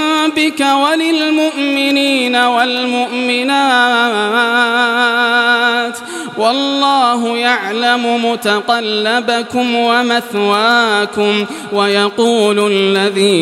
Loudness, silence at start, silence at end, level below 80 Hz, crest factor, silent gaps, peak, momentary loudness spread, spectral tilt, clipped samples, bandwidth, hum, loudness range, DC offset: -12 LUFS; 0 s; 0 s; -64 dBFS; 12 dB; none; 0 dBFS; 4 LU; -3.5 dB/octave; under 0.1%; 15.5 kHz; none; 2 LU; under 0.1%